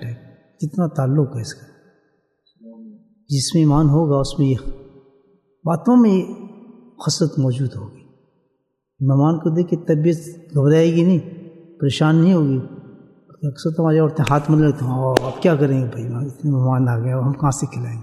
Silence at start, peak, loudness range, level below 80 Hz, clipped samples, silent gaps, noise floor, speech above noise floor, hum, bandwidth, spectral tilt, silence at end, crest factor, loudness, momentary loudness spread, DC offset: 0 s; 0 dBFS; 4 LU; -44 dBFS; under 0.1%; none; -71 dBFS; 54 dB; none; 12.5 kHz; -7 dB/octave; 0 s; 18 dB; -18 LUFS; 15 LU; under 0.1%